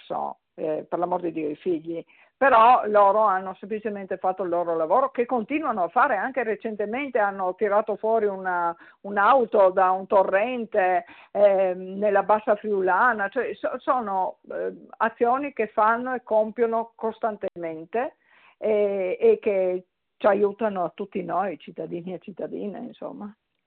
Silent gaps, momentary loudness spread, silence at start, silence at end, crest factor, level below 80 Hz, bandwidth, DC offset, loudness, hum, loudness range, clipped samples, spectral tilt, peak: none; 14 LU; 0.1 s; 0.35 s; 16 dB; -70 dBFS; 4.3 kHz; under 0.1%; -24 LUFS; none; 5 LU; under 0.1%; -4 dB/octave; -8 dBFS